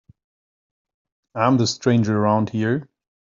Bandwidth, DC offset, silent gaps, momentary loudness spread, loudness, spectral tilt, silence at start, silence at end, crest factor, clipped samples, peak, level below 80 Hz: 7.6 kHz; under 0.1%; none; 7 LU; -20 LUFS; -6 dB/octave; 1.35 s; 0.55 s; 18 dB; under 0.1%; -4 dBFS; -62 dBFS